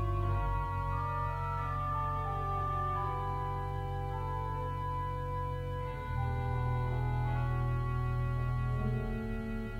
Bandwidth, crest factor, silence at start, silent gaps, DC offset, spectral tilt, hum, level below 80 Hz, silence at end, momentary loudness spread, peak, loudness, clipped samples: 8.4 kHz; 12 dB; 0 s; none; under 0.1%; -8.5 dB/octave; none; -40 dBFS; 0 s; 4 LU; -22 dBFS; -35 LUFS; under 0.1%